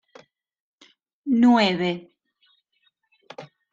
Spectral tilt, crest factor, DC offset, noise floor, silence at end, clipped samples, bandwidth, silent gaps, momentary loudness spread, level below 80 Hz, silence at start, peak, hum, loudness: -6 dB/octave; 20 dB; under 0.1%; -70 dBFS; 0.3 s; under 0.1%; 7.6 kHz; none; 26 LU; -70 dBFS; 1.25 s; -6 dBFS; none; -20 LUFS